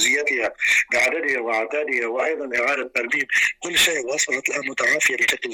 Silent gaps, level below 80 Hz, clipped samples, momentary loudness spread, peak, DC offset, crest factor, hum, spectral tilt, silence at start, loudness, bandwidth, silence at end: none; -60 dBFS; under 0.1%; 5 LU; -8 dBFS; under 0.1%; 14 dB; none; 0 dB/octave; 0 s; -20 LUFS; 17.5 kHz; 0 s